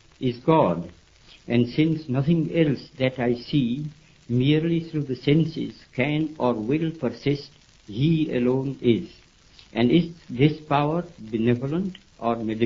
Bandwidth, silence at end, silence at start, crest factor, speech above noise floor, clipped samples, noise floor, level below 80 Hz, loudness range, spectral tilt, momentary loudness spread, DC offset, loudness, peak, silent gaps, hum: 7.4 kHz; 0 s; 0.2 s; 18 dB; 30 dB; under 0.1%; -53 dBFS; -54 dBFS; 2 LU; -8.5 dB/octave; 10 LU; under 0.1%; -24 LUFS; -4 dBFS; none; none